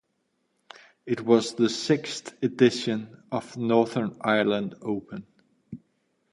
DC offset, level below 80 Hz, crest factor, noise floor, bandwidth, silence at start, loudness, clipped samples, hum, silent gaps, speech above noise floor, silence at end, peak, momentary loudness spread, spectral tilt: under 0.1%; -68 dBFS; 20 dB; -74 dBFS; 11.5 kHz; 1.05 s; -26 LUFS; under 0.1%; none; none; 49 dB; 0.55 s; -6 dBFS; 20 LU; -5.5 dB/octave